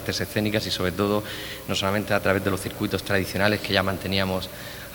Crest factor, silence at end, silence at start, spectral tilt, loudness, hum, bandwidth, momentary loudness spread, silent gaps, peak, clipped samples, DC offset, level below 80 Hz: 24 dB; 0 s; 0 s; -4.5 dB/octave; -25 LUFS; none; over 20 kHz; 7 LU; none; -2 dBFS; under 0.1%; under 0.1%; -50 dBFS